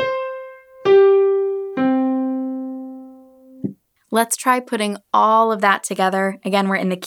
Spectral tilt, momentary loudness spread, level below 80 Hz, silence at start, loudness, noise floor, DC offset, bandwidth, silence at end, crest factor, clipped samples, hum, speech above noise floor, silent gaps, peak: -4.5 dB/octave; 17 LU; -70 dBFS; 0 s; -18 LUFS; -44 dBFS; under 0.1%; 17.5 kHz; 0 s; 18 dB; under 0.1%; none; 26 dB; none; -2 dBFS